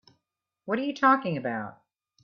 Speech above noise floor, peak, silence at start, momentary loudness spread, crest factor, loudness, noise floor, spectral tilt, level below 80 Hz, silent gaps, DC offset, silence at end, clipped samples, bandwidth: 57 dB; -8 dBFS; 0.65 s; 18 LU; 22 dB; -26 LUFS; -83 dBFS; -6.5 dB/octave; -76 dBFS; none; under 0.1%; 0.5 s; under 0.1%; 6.8 kHz